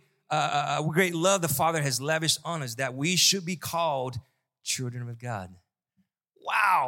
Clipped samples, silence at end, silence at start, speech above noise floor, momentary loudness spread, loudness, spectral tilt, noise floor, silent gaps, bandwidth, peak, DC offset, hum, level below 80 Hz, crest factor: under 0.1%; 0 s; 0.3 s; 47 dB; 15 LU; -26 LUFS; -3 dB/octave; -74 dBFS; none; 17 kHz; -8 dBFS; under 0.1%; none; -68 dBFS; 20 dB